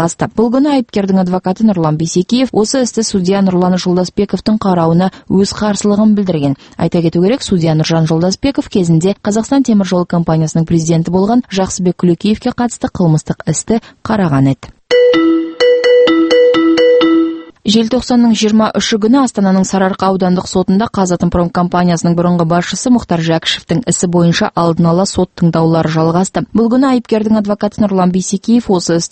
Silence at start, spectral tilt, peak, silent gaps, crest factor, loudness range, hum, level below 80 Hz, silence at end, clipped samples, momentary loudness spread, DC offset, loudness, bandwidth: 0 s; -6 dB/octave; 0 dBFS; none; 12 dB; 3 LU; none; -40 dBFS; 0.05 s; under 0.1%; 6 LU; under 0.1%; -12 LUFS; 8.8 kHz